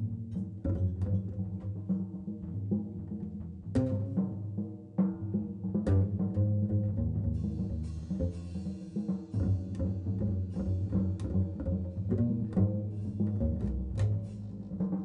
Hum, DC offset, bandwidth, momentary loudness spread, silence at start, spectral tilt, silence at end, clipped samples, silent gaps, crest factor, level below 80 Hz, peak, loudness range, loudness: none; under 0.1%; 5.4 kHz; 9 LU; 0 s; -10.5 dB/octave; 0 s; under 0.1%; none; 14 dB; -46 dBFS; -18 dBFS; 3 LU; -34 LUFS